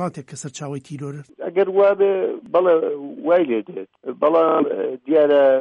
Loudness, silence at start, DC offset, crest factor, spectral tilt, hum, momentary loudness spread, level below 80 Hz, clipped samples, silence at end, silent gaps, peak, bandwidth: -18 LUFS; 0 s; under 0.1%; 14 dB; -6 dB/octave; none; 16 LU; -70 dBFS; under 0.1%; 0 s; none; -6 dBFS; 11 kHz